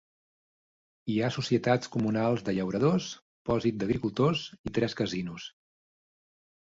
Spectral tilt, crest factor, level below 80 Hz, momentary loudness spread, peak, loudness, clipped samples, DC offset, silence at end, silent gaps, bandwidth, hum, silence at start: -6.5 dB/octave; 18 dB; -58 dBFS; 12 LU; -12 dBFS; -29 LUFS; under 0.1%; under 0.1%; 1.15 s; 3.22-3.45 s, 4.59-4.64 s; 7.8 kHz; none; 1.05 s